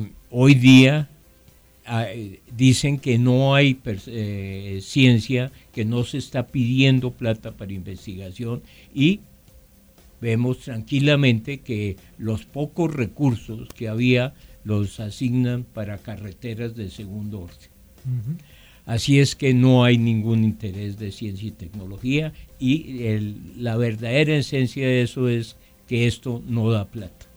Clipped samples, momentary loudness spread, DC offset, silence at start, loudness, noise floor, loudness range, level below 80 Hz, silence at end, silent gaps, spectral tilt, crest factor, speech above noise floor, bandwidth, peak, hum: under 0.1%; 17 LU; under 0.1%; 0 s; -21 LUFS; -53 dBFS; 7 LU; -48 dBFS; 0.3 s; none; -6.5 dB/octave; 20 dB; 32 dB; over 20 kHz; -2 dBFS; none